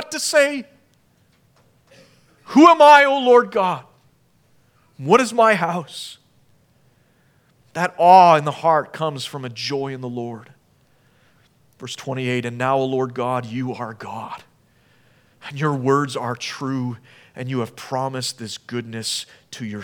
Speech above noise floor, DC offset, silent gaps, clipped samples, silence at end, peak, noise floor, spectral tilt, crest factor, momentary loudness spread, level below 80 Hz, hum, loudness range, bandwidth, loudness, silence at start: 41 dB; under 0.1%; none; under 0.1%; 0 s; 0 dBFS; -59 dBFS; -4.5 dB/octave; 20 dB; 21 LU; -70 dBFS; none; 11 LU; 18.5 kHz; -18 LUFS; 0 s